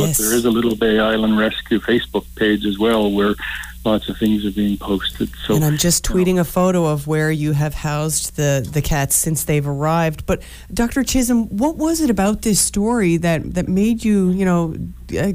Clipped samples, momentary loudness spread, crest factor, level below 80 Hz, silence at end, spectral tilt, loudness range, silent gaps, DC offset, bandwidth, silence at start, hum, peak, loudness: under 0.1%; 6 LU; 12 dB; -34 dBFS; 0 s; -4.5 dB/octave; 2 LU; none; under 0.1%; 16 kHz; 0 s; none; -6 dBFS; -18 LUFS